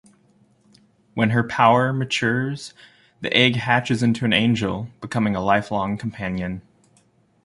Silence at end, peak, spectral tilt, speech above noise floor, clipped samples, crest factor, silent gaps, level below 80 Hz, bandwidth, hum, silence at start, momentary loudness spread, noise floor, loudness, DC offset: 0.85 s; -2 dBFS; -5.5 dB/octave; 39 dB; under 0.1%; 20 dB; none; -52 dBFS; 11.5 kHz; none; 1.15 s; 14 LU; -60 dBFS; -21 LUFS; under 0.1%